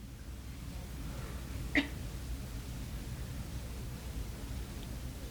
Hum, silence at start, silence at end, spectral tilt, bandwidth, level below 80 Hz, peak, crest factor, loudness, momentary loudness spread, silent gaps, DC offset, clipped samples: none; 0 s; 0 s; -5 dB/octave; over 20 kHz; -44 dBFS; -16 dBFS; 24 dB; -41 LUFS; 12 LU; none; under 0.1%; under 0.1%